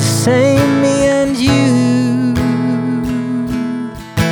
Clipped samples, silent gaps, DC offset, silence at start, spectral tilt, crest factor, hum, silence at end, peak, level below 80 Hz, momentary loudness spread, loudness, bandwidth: under 0.1%; none; under 0.1%; 0 s; -5.5 dB/octave; 12 dB; none; 0 s; 0 dBFS; -38 dBFS; 8 LU; -14 LUFS; 20 kHz